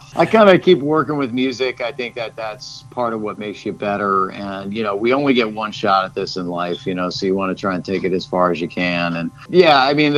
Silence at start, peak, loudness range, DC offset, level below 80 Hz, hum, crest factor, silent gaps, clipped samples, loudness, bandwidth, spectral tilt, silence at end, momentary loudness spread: 0 s; 0 dBFS; 5 LU; under 0.1%; -56 dBFS; none; 18 dB; none; under 0.1%; -18 LUFS; 11 kHz; -6 dB/octave; 0 s; 14 LU